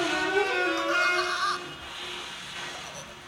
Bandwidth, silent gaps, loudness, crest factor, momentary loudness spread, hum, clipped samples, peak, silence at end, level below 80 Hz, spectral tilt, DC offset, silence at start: 17 kHz; none; -28 LUFS; 16 dB; 13 LU; none; under 0.1%; -12 dBFS; 0 s; -60 dBFS; -2 dB/octave; under 0.1%; 0 s